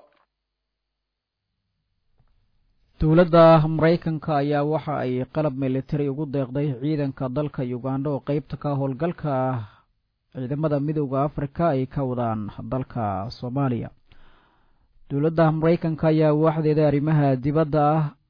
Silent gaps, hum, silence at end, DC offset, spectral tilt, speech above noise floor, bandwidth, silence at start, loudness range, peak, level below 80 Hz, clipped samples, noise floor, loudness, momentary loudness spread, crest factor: none; none; 0.2 s; under 0.1%; -10.5 dB/octave; 60 dB; 5.2 kHz; 3 s; 7 LU; -4 dBFS; -46 dBFS; under 0.1%; -82 dBFS; -23 LUFS; 10 LU; 20 dB